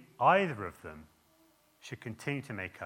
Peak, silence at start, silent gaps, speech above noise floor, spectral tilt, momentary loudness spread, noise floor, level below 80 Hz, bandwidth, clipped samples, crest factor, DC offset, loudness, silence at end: -12 dBFS; 0 s; none; 34 dB; -6 dB/octave; 23 LU; -67 dBFS; -72 dBFS; 17 kHz; under 0.1%; 22 dB; under 0.1%; -32 LUFS; 0 s